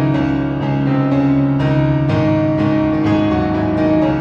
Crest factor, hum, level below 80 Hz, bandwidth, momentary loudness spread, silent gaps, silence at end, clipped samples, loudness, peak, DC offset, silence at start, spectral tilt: 12 dB; none; -36 dBFS; 6.6 kHz; 3 LU; none; 0 s; under 0.1%; -15 LUFS; -4 dBFS; under 0.1%; 0 s; -9.5 dB/octave